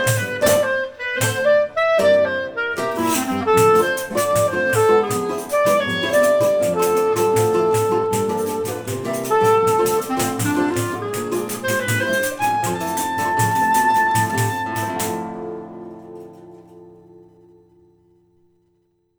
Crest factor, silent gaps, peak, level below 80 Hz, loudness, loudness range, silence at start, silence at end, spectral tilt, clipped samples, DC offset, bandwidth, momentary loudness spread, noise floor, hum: 16 dB; none; -2 dBFS; -56 dBFS; -19 LUFS; 5 LU; 0 s; 2 s; -4.5 dB/octave; under 0.1%; under 0.1%; over 20 kHz; 9 LU; -65 dBFS; none